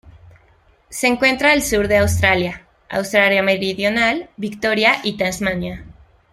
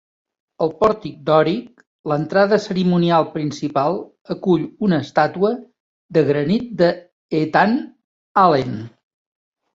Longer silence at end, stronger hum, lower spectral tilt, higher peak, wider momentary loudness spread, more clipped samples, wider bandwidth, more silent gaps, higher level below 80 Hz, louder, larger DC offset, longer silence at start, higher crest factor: second, 0.4 s vs 0.85 s; neither; second, -4 dB/octave vs -7.5 dB/octave; about the same, -2 dBFS vs -2 dBFS; about the same, 12 LU vs 12 LU; neither; first, 16 kHz vs 7.6 kHz; second, none vs 1.87-2.04 s, 4.21-4.25 s, 5.80-6.09 s, 7.12-7.29 s, 8.04-8.35 s; first, -42 dBFS vs -56 dBFS; about the same, -17 LUFS vs -19 LUFS; neither; second, 0.05 s vs 0.6 s; about the same, 18 dB vs 18 dB